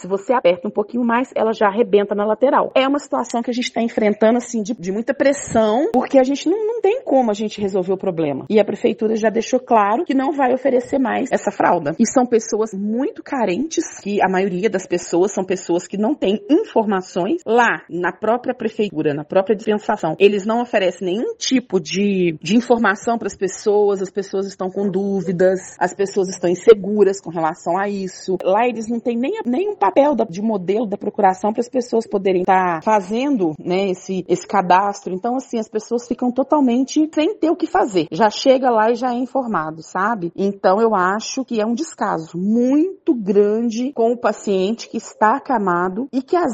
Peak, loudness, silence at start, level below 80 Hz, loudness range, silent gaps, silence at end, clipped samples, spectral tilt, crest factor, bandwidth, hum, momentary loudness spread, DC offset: 0 dBFS; -18 LUFS; 0 s; -60 dBFS; 2 LU; none; 0 s; under 0.1%; -5 dB/octave; 18 dB; 8.8 kHz; none; 7 LU; under 0.1%